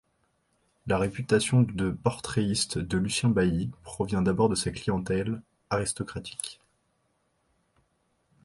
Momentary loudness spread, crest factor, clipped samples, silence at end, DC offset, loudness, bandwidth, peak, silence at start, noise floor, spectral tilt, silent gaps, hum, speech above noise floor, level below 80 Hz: 11 LU; 20 dB; under 0.1%; 1.9 s; under 0.1%; -28 LUFS; 11.5 kHz; -10 dBFS; 0.85 s; -73 dBFS; -5 dB/octave; none; none; 46 dB; -50 dBFS